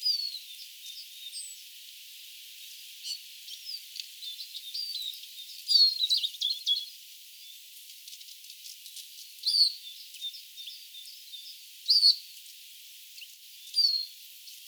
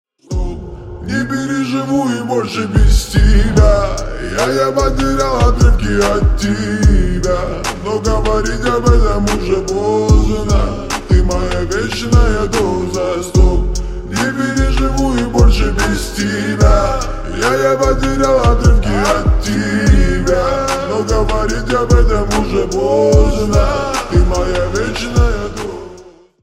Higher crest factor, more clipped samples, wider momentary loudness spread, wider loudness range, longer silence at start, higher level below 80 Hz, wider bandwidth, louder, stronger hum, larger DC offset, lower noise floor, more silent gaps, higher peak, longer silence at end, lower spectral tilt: first, 22 dB vs 12 dB; neither; first, 23 LU vs 8 LU; first, 13 LU vs 2 LU; second, 0 s vs 0.3 s; second, under -90 dBFS vs -16 dBFS; first, over 20 kHz vs 13.5 kHz; second, -27 LUFS vs -15 LUFS; neither; neither; first, -49 dBFS vs -39 dBFS; neither; second, -10 dBFS vs 0 dBFS; second, 0 s vs 0.35 s; second, 11.5 dB/octave vs -6 dB/octave